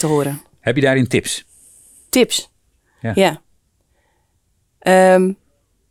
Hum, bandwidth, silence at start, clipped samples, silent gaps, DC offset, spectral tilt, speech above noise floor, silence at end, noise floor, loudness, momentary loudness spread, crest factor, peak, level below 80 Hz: none; 18.5 kHz; 0 s; under 0.1%; none; under 0.1%; -4.5 dB/octave; 49 dB; 0.55 s; -64 dBFS; -16 LUFS; 13 LU; 16 dB; -2 dBFS; -56 dBFS